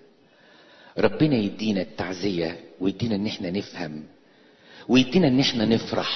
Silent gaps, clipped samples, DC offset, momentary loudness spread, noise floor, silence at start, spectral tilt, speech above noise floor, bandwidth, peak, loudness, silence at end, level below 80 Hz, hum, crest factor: none; under 0.1%; under 0.1%; 14 LU; -55 dBFS; 0.95 s; -6 dB/octave; 32 dB; 6.4 kHz; -6 dBFS; -24 LUFS; 0 s; -54 dBFS; none; 20 dB